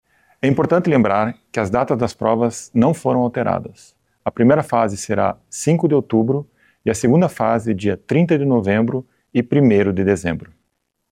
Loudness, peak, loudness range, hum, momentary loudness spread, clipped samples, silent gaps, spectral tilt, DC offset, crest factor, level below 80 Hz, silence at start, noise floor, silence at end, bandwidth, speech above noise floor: -18 LUFS; -4 dBFS; 2 LU; none; 8 LU; under 0.1%; none; -7 dB/octave; under 0.1%; 14 dB; -52 dBFS; 0.45 s; -72 dBFS; 0.65 s; 14 kHz; 55 dB